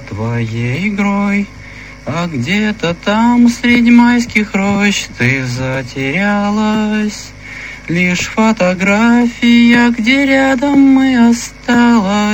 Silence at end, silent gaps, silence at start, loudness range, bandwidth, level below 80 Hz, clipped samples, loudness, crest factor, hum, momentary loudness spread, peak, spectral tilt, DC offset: 0 s; none; 0 s; 5 LU; 16 kHz; -38 dBFS; under 0.1%; -12 LUFS; 12 dB; none; 11 LU; 0 dBFS; -5.5 dB/octave; 0.2%